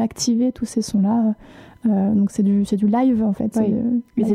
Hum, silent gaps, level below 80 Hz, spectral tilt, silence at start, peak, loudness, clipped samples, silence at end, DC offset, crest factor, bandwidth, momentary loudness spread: none; none; -52 dBFS; -6.5 dB/octave; 0 s; -8 dBFS; -19 LUFS; under 0.1%; 0 s; under 0.1%; 10 dB; 12.5 kHz; 5 LU